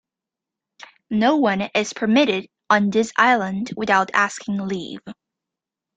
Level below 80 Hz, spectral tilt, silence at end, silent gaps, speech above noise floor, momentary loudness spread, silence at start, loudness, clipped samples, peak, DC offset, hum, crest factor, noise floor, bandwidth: -64 dBFS; -4.5 dB/octave; 0.85 s; none; 67 dB; 10 LU; 1.1 s; -20 LUFS; under 0.1%; -2 dBFS; under 0.1%; none; 20 dB; -87 dBFS; 9.2 kHz